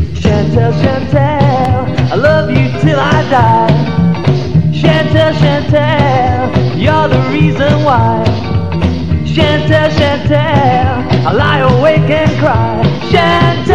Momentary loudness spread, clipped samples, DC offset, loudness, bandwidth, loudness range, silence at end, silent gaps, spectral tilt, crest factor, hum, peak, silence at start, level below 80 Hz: 4 LU; under 0.1%; 5%; -10 LUFS; 8 kHz; 1 LU; 0 s; none; -7.5 dB/octave; 10 dB; none; 0 dBFS; 0 s; -28 dBFS